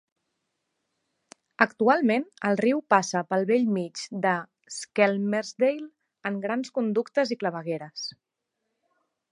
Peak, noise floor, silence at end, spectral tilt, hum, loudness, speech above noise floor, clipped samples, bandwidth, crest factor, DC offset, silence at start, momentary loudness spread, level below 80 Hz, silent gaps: -2 dBFS; -82 dBFS; 1.2 s; -5 dB/octave; none; -26 LUFS; 56 dB; under 0.1%; 11.5 kHz; 24 dB; under 0.1%; 1.6 s; 13 LU; -80 dBFS; none